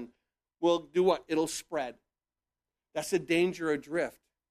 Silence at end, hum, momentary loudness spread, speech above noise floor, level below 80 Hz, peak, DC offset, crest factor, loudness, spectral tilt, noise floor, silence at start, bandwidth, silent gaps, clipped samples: 0.4 s; none; 10 LU; over 60 dB; -70 dBFS; -14 dBFS; under 0.1%; 18 dB; -31 LUFS; -4.5 dB/octave; under -90 dBFS; 0 s; 15 kHz; none; under 0.1%